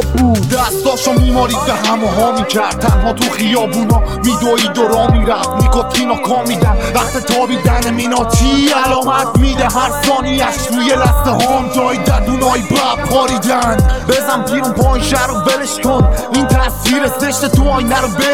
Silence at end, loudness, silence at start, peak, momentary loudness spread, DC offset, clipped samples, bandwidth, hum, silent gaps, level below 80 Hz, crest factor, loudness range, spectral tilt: 0 s; -13 LUFS; 0 s; 0 dBFS; 3 LU; 0.9%; under 0.1%; 18 kHz; none; none; -20 dBFS; 12 dB; 1 LU; -4.5 dB/octave